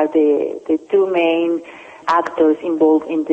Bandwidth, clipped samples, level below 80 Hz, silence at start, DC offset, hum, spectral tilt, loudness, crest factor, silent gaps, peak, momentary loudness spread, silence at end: 8 kHz; under 0.1%; -64 dBFS; 0 s; under 0.1%; none; -6 dB/octave; -17 LUFS; 12 dB; none; -4 dBFS; 7 LU; 0 s